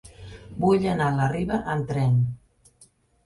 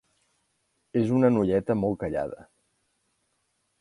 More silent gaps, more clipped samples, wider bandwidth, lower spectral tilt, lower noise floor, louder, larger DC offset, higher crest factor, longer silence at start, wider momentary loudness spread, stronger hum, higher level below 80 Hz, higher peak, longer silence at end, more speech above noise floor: neither; neither; about the same, 11.5 kHz vs 11 kHz; about the same, -8 dB/octave vs -9 dB/octave; second, -58 dBFS vs -74 dBFS; about the same, -24 LUFS vs -26 LUFS; neither; about the same, 16 dB vs 18 dB; second, 0.2 s vs 0.95 s; first, 20 LU vs 12 LU; neither; first, -48 dBFS vs -56 dBFS; about the same, -10 dBFS vs -10 dBFS; second, 0.9 s vs 1.45 s; second, 36 dB vs 50 dB